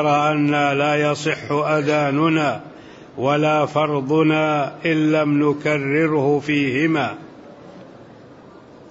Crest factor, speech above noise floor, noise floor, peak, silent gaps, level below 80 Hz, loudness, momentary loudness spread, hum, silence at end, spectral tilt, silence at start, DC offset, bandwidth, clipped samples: 14 dB; 25 dB; -43 dBFS; -6 dBFS; none; -62 dBFS; -19 LUFS; 5 LU; none; 0 s; -6.5 dB/octave; 0 s; under 0.1%; 8 kHz; under 0.1%